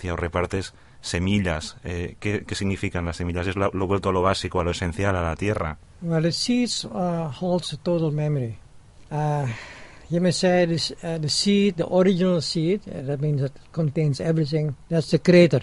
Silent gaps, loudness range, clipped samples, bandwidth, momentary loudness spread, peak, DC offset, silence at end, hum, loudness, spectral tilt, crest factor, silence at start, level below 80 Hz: none; 5 LU; under 0.1%; 11.5 kHz; 10 LU; -4 dBFS; under 0.1%; 0 s; none; -24 LUFS; -6 dB/octave; 18 dB; 0 s; -40 dBFS